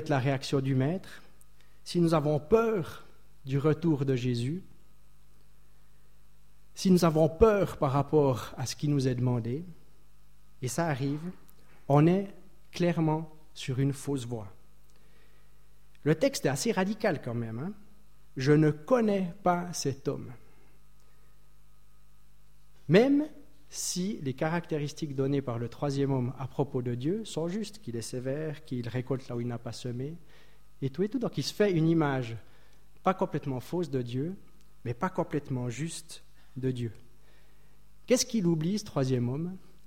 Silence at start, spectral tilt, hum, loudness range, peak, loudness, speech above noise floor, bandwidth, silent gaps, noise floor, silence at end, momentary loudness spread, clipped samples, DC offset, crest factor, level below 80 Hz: 0 s; -6 dB/octave; 50 Hz at -55 dBFS; 7 LU; -8 dBFS; -30 LUFS; 33 dB; 16.5 kHz; none; -62 dBFS; 0.3 s; 15 LU; under 0.1%; 0.5%; 22 dB; -54 dBFS